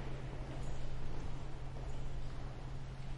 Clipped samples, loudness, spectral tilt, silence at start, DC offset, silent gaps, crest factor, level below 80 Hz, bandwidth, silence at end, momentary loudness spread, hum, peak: under 0.1%; -47 LUFS; -6.5 dB/octave; 0 s; under 0.1%; none; 12 dB; -44 dBFS; 8.2 kHz; 0 s; 2 LU; none; -28 dBFS